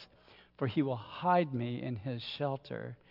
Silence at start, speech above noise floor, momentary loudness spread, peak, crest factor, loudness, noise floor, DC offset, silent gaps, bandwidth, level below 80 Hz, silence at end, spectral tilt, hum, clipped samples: 0 s; 27 dB; 10 LU; -16 dBFS; 18 dB; -35 LUFS; -61 dBFS; under 0.1%; none; 5.8 kHz; -72 dBFS; 0.15 s; -9 dB/octave; none; under 0.1%